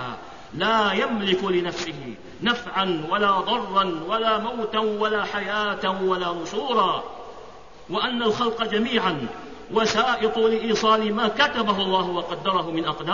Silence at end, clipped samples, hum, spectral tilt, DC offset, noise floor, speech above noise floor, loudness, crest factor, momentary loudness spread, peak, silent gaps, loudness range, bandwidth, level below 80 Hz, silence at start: 0 s; under 0.1%; none; -4.5 dB/octave; 0.5%; -44 dBFS; 20 dB; -23 LUFS; 16 dB; 10 LU; -6 dBFS; none; 3 LU; 7.4 kHz; -54 dBFS; 0 s